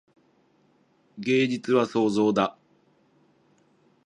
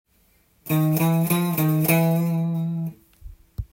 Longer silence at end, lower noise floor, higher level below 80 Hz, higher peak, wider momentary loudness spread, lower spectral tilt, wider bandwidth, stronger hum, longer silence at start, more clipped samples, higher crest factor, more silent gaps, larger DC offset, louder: first, 1.55 s vs 0.1 s; about the same, -64 dBFS vs -61 dBFS; second, -70 dBFS vs -48 dBFS; about the same, -8 dBFS vs -6 dBFS; second, 6 LU vs 16 LU; about the same, -6 dB/octave vs -6.5 dB/octave; second, 10.5 kHz vs 17 kHz; neither; first, 1.15 s vs 0.65 s; neither; about the same, 20 dB vs 18 dB; neither; neither; about the same, -24 LUFS vs -22 LUFS